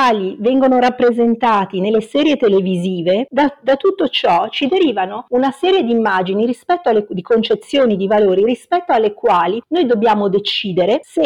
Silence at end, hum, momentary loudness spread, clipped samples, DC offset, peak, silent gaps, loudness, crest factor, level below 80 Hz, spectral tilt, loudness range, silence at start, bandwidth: 0 s; none; 4 LU; under 0.1%; 0.1%; -6 dBFS; none; -15 LUFS; 8 dB; -58 dBFS; -6.5 dB/octave; 1 LU; 0 s; 11 kHz